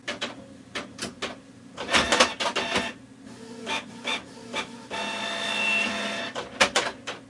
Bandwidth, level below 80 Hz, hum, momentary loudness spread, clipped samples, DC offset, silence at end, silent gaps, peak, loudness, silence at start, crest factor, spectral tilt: 11.5 kHz; -58 dBFS; none; 18 LU; under 0.1%; under 0.1%; 0 s; none; -2 dBFS; -26 LUFS; 0.05 s; 26 dB; -1.5 dB/octave